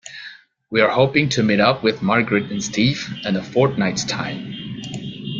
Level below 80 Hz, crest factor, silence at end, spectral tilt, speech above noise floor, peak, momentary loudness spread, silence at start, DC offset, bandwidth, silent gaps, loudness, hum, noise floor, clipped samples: -54 dBFS; 18 dB; 0 s; -5 dB/octave; 23 dB; -2 dBFS; 14 LU; 0.05 s; under 0.1%; 7.8 kHz; none; -19 LUFS; none; -41 dBFS; under 0.1%